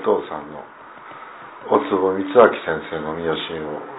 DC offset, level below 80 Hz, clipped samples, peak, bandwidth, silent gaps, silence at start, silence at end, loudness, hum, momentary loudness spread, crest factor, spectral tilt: under 0.1%; -56 dBFS; under 0.1%; 0 dBFS; 4 kHz; none; 0 s; 0 s; -20 LUFS; none; 23 LU; 20 dB; -9 dB/octave